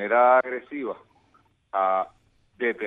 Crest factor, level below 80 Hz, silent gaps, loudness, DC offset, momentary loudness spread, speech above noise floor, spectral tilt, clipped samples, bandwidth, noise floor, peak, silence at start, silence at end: 18 dB; -70 dBFS; none; -24 LUFS; under 0.1%; 17 LU; 40 dB; -7 dB/octave; under 0.1%; 3.9 kHz; -63 dBFS; -8 dBFS; 0 s; 0 s